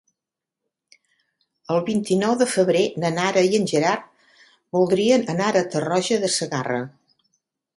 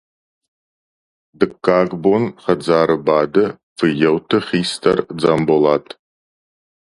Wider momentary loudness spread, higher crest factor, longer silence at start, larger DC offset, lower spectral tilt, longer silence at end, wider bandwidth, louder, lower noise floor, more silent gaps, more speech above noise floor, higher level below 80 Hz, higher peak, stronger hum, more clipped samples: about the same, 7 LU vs 5 LU; about the same, 18 dB vs 18 dB; first, 1.7 s vs 1.4 s; neither; second, -4.5 dB/octave vs -6 dB/octave; second, 0.9 s vs 1.15 s; about the same, 11.5 kHz vs 11.5 kHz; second, -21 LUFS vs -17 LUFS; second, -86 dBFS vs under -90 dBFS; second, none vs 3.63-3.76 s; second, 66 dB vs over 74 dB; second, -66 dBFS vs -54 dBFS; second, -4 dBFS vs 0 dBFS; neither; neither